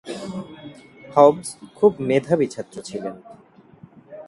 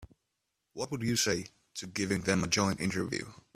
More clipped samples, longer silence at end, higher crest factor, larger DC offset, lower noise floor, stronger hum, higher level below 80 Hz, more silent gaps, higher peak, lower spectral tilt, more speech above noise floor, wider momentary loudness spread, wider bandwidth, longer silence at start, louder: neither; second, 0.05 s vs 0.2 s; about the same, 22 dB vs 22 dB; neither; second, -48 dBFS vs -83 dBFS; neither; about the same, -62 dBFS vs -60 dBFS; neither; first, 0 dBFS vs -12 dBFS; first, -6 dB/octave vs -3.5 dB/octave; second, 28 dB vs 51 dB; first, 23 LU vs 13 LU; second, 11.5 kHz vs 15.5 kHz; about the same, 0.05 s vs 0 s; first, -20 LUFS vs -32 LUFS